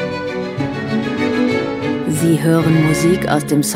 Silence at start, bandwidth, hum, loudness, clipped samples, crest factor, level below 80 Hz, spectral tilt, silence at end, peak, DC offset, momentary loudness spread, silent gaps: 0 s; 16 kHz; none; -16 LUFS; under 0.1%; 16 dB; -44 dBFS; -6 dB/octave; 0 s; 0 dBFS; under 0.1%; 8 LU; none